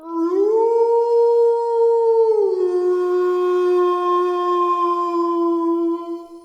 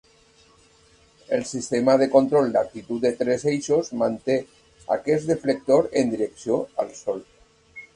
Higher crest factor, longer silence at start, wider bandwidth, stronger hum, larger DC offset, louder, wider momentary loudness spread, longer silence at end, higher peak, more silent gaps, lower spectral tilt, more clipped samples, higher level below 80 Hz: second, 10 dB vs 20 dB; second, 0 s vs 1.3 s; second, 7.6 kHz vs 11 kHz; neither; neither; first, -18 LUFS vs -23 LUFS; second, 4 LU vs 11 LU; about the same, 0.05 s vs 0.1 s; second, -6 dBFS vs -2 dBFS; neither; about the same, -4.5 dB/octave vs -5.5 dB/octave; neither; second, -76 dBFS vs -60 dBFS